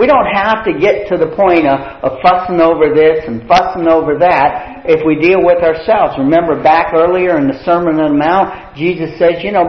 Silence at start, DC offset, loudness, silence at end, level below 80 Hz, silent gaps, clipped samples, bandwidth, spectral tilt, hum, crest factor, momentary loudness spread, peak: 0 s; 0.4%; -11 LUFS; 0 s; -40 dBFS; none; under 0.1%; 6.4 kHz; -7.5 dB/octave; none; 10 dB; 6 LU; 0 dBFS